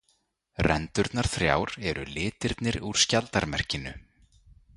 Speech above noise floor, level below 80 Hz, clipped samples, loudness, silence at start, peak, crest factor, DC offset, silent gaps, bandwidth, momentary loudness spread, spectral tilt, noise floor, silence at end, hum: 44 dB; -44 dBFS; under 0.1%; -27 LUFS; 0.6 s; -6 dBFS; 24 dB; under 0.1%; none; 11.5 kHz; 9 LU; -3.5 dB/octave; -71 dBFS; 0.75 s; none